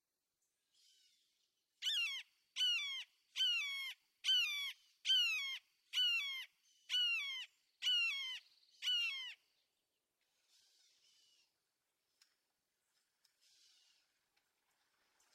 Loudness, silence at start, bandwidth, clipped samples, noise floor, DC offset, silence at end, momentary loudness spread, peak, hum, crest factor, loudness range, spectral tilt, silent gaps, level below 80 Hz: -37 LUFS; 1.8 s; 15.5 kHz; under 0.1%; -89 dBFS; under 0.1%; 6 s; 14 LU; -26 dBFS; none; 18 dB; 8 LU; 7 dB/octave; none; under -90 dBFS